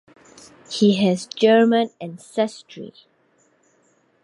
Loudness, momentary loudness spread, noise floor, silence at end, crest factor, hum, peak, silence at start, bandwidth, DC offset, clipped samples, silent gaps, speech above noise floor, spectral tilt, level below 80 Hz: -19 LUFS; 23 LU; -62 dBFS; 1.35 s; 18 dB; none; -4 dBFS; 0.7 s; 11.5 kHz; under 0.1%; under 0.1%; none; 42 dB; -5.5 dB/octave; -70 dBFS